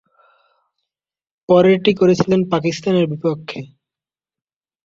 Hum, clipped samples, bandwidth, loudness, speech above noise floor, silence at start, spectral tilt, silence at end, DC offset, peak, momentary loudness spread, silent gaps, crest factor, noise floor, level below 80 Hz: none; under 0.1%; 7.6 kHz; -16 LUFS; over 75 dB; 1.5 s; -6.5 dB/octave; 1.2 s; under 0.1%; -2 dBFS; 13 LU; none; 18 dB; under -90 dBFS; -56 dBFS